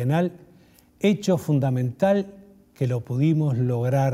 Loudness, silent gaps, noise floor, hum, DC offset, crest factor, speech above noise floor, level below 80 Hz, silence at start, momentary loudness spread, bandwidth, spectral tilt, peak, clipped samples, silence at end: -23 LUFS; none; -55 dBFS; none; under 0.1%; 16 dB; 33 dB; -60 dBFS; 0 s; 6 LU; 15 kHz; -8 dB/octave; -8 dBFS; under 0.1%; 0 s